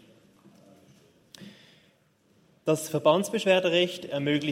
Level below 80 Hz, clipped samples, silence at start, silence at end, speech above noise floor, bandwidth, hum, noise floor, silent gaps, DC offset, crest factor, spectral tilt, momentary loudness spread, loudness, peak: -76 dBFS; under 0.1%; 1.4 s; 0 s; 40 dB; 16 kHz; none; -65 dBFS; none; under 0.1%; 22 dB; -4.5 dB/octave; 24 LU; -25 LUFS; -8 dBFS